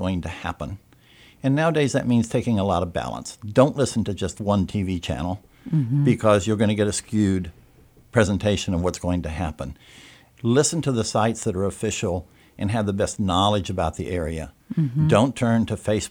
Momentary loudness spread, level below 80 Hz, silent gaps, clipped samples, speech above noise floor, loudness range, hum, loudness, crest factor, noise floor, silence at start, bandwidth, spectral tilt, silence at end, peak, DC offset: 11 LU; -44 dBFS; none; under 0.1%; 30 dB; 3 LU; none; -23 LUFS; 20 dB; -53 dBFS; 0 s; 16.5 kHz; -5.5 dB/octave; 0 s; -2 dBFS; under 0.1%